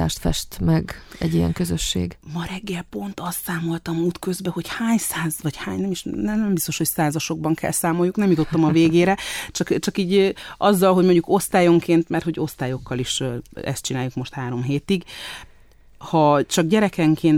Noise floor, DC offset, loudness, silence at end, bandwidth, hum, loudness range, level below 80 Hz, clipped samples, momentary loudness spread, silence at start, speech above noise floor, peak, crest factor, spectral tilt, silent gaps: -49 dBFS; under 0.1%; -21 LUFS; 0 s; 17 kHz; none; 7 LU; -42 dBFS; under 0.1%; 12 LU; 0 s; 28 dB; -4 dBFS; 16 dB; -5.5 dB/octave; none